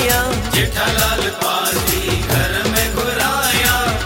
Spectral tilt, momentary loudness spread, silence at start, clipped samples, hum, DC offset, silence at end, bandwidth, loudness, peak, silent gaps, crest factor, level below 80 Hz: -3 dB/octave; 4 LU; 0 s; under 0.1%; none; under 0.1%; 0 s; 17 kHz; -16 LUFS; 0 dBFS; none; 16 dB; -28 dBFS